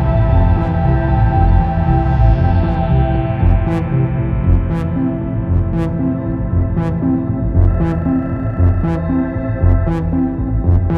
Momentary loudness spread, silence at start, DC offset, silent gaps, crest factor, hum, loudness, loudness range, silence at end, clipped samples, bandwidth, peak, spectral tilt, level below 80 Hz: 5 LU; 0 s; under 0.1%; none; 12 dB; none; -16 LUFS; 3 LU; 0 s; under 0.1%; 4.7 kHz; 0 dBFS; -11 dB/octave; -20 dBFS